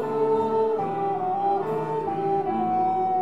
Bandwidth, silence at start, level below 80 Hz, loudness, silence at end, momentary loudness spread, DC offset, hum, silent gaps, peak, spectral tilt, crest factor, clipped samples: 7.6 kHz; 0 s; -68 dBFS; -25 LUFS; 0 s; 4 LU; 0.4%; none; none; -12 dBFS; -8.5 dB/octave; 10 dB; under 0.1%